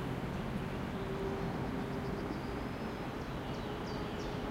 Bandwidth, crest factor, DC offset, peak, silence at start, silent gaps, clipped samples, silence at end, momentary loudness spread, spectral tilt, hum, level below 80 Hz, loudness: 16 kHz; 14 dB; under 0.1%; -24 dBFS; 0 s; none; under 0.1%; 0 s; 3 LU; -6.5 dB/octave; none; -50 dBFS; -39 LUFS